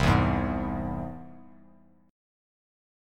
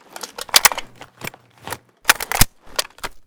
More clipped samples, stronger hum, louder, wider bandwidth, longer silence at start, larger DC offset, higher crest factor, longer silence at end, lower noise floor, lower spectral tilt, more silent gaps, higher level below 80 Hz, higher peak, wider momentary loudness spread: second, under 0.1% vs 0.3%; neither; second, -29 LUFS vs -17 LUFS; second, 14 kHz vs over 20 kHz; second, 0 s vs 0.2 s; neither; about the same, 22 dB vs 22 dB; first, 0.95 s vs 0.05 s; first, -58 dBFS vs -36 dBFS; first, -7 dB/octave vs -0.5 dB/octave; neither; second, -40 dBFS vs -34 dBFS; second, -8 dBFS vs 0 dBFS; about the same, 20 LU vs 20 LU